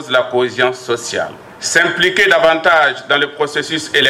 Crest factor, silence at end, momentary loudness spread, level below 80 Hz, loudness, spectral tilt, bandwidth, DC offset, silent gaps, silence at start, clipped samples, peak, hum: 12 dB; 0 s; 10 LU; -54 dBFS; -14 LUFS; -2.5 dB/octave; 16.5 kHz; under 0.1%; none; 0 s; under 0.1%; -2 dBFS; none